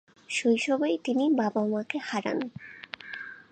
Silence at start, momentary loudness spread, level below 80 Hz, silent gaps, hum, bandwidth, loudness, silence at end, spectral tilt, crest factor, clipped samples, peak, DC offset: 0.3 s; 15 LU; -76 dBFS; none; none; 9.4 kHz; -28 LUFS; 0.1 s; -4.5 dB/octave; 16 dB; under 0.1%; -12 dBFS; under 0.1%